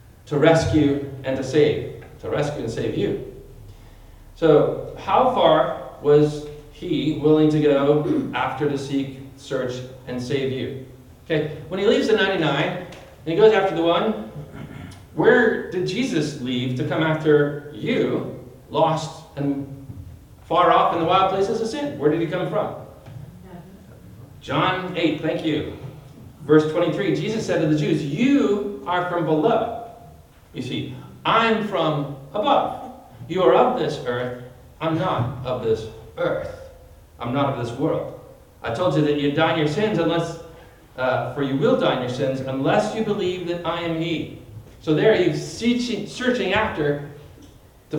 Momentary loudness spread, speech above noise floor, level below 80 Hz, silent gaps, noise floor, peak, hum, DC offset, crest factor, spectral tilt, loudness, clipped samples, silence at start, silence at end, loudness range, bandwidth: 18 LU; 27 dB; -52 dBFS; none; -48 dBFS; -2 dBFS; none; under 0.1%; 18 dB; -6.5 dB/octave; -21 LUFS; under 0.1%; 0.25 s; 0 s; 6 LU; 17 kHz